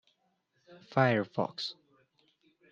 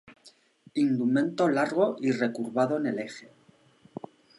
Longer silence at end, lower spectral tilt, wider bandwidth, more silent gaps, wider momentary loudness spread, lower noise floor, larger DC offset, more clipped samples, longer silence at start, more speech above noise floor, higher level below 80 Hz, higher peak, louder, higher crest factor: second, 1 s vs 1.2 s; about the same, -6.5 dB/octave vs -6.5 dB/octave; second, 7.6 kHz vs 11.5 kHz; neither; second, 12 LU vs 19 LU; first, -76 dBFS vs -59 dBFS; neither; neither; first, 0.7 s vs 0.1 s; first, 45 dB vs 33 dB; about the same, -80 dBFS vs -80 dBFS; about the same, -12 dBFS vs -10 dBFS; second, -31 LUFS vs -27 LUFS; about the same, 22 dB vs 18 dB